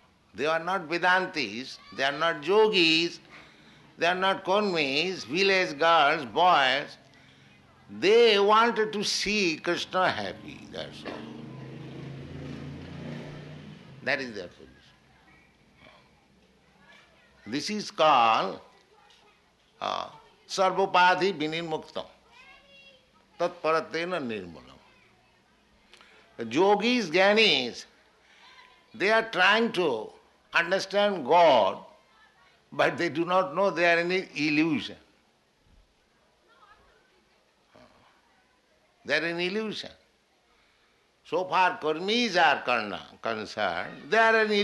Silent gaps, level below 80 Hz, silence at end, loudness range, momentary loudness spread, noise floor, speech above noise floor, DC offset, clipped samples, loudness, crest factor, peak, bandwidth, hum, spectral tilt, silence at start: none; -68 dBFS; 0 s; 13 LU; 20 LU; -66 dBFS; 41 dB; under 0.1%; under 0.1%; -25 LUFS; 20 dB; -8 dBFS; 12 kHz; none; -3.5 dB/octave; 0.35 s